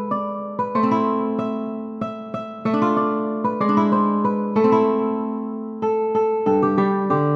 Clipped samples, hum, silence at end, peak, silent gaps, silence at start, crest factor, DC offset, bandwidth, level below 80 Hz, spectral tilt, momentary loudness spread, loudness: under 0.1%; none; 0 s; -6 dBFS; none; 0 s; 14 dB; under 0.1%; 6.4 kHz; -64 dBFS; -9 dB/octave; 11 LU; -21 LUFS